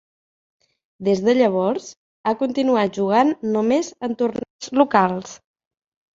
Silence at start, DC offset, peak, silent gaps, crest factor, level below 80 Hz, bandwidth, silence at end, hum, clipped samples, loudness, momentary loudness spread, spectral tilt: 1 s; under 0.1%; -2 dBFS; 1.97-2.24 s, 4.50-4.59 s; 20 dB; -64 dBFS; 7.8 kHz; 0.8 s; none; under 0.1%; -20 LUFS; 11 LU; -5.5 dB/octave